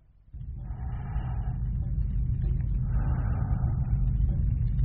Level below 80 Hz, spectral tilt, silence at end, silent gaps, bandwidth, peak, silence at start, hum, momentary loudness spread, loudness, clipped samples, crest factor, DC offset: -30 dBFS; -10 dB/octave; 0 s; none; 3 kHz; -14 dBFS; 0.35 s; none; 10 LU; -30 LUFS; under 0.1%; 12 dB; under 0.1%